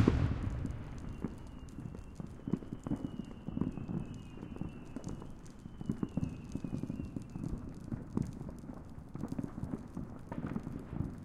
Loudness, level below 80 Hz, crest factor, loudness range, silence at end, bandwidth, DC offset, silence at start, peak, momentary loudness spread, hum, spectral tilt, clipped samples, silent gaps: -42 LUFS; -48 dBFS; 28 dB; 2 LU; 0 s; 13 kHz; under 0.1%; 0 s; -10 dBFS; 10 LU; none; -8 dB/octave; under 0.1%; none